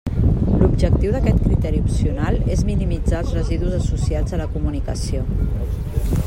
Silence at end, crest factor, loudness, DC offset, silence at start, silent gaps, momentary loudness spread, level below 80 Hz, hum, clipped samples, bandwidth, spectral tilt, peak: 0 s; 16 dB; -20 LUFS; under 0.1%; 0.05 s; none; 7 LU; -22 dBFS; none; under 0.1%; 15.5 kHz; -8 dB/octave; -2 dBFS